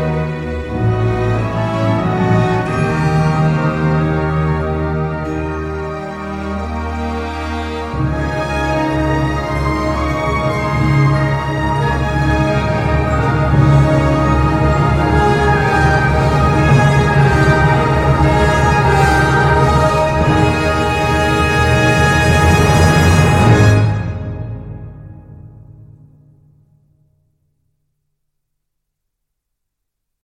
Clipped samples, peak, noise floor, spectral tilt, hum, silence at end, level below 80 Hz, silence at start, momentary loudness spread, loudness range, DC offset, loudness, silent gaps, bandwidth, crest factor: under 0.1%; 0 dBFS; -75 dBFS; -6.5 dB/octave; none; 4.65 s; -24 dBFS; 0 s; 11 LU; 8 LU; under 0.1%; -14 LUFS; none; 14 kHz; 14 dB